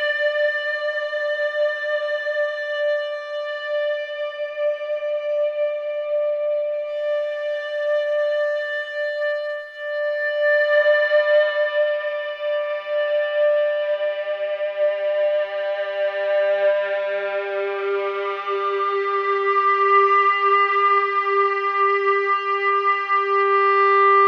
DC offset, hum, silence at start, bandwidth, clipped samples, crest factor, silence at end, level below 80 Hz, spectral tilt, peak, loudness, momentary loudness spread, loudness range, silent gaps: under 0.1%; none; 0 s; 6.4 kHz; under 0.1%; 14 dB; 0 s; -80 dBFS; -2 dB/octave; -6 dBFS; -21 LUFS; 9 LU; 6 LU; none